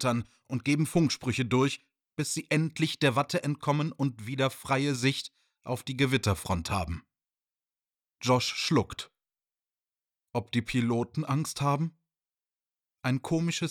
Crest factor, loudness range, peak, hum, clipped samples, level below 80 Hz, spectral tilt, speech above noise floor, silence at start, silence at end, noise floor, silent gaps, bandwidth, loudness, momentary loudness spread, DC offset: 20 dB; 4 LU; -12 dBFS; none; under 0.1%; -56 dBFS; -5 dB/octave; over 61 dB; 0 s; 0 s; under -90 dBFS; none; 17.5 kHz; -29 LUFS; 10 LU; under 0.1%